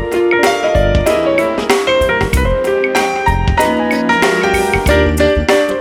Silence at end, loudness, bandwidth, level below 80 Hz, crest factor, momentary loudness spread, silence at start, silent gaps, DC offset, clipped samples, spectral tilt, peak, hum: 0 s; -13 LUFS; 17.5 kHz; -22 dBFS; 12 dB; 3 LU; 0 s; none; under 0.1%; under 0.1%; -5 dB/octave; 0 dBFS; none